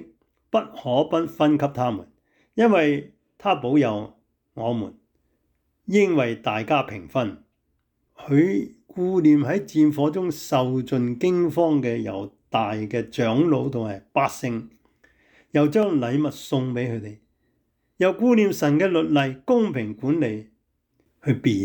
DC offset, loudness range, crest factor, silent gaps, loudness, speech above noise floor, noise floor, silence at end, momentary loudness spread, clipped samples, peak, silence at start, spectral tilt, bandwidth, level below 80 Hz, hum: under 0.1%; 4 LU; 14 dB; none; -22 LUFS; 50 dB; -72 dBFS; 0 s; 11 LU; under 0.1%; -8 dBFS; 0 s; -7 dB/octave; 19.5 kHz; -64 dBFS; none